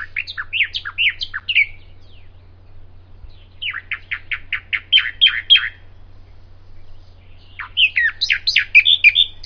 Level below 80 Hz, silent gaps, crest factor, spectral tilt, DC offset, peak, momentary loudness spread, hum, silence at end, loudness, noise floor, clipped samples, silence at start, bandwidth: -42 dBFS; none; 20 dB; 0.5 dB/octave; under 0.1%; 0 dBFS; 16 LU; none; 0 s; -15 LUFS; -41 dBFS; under 0.1%; 0 s; 5.4 kHz